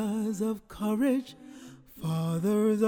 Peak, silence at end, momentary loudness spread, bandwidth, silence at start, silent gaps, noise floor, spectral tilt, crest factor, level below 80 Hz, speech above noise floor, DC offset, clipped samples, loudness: -14 dBFS; 0 s; 21 LU; 18 kHz; 0 s; none; -49 dBFS; -7 dB/octave; 16 dB; -62 dBFS; 21 dB; under 0.1%; under 0.1%; -30 LUFS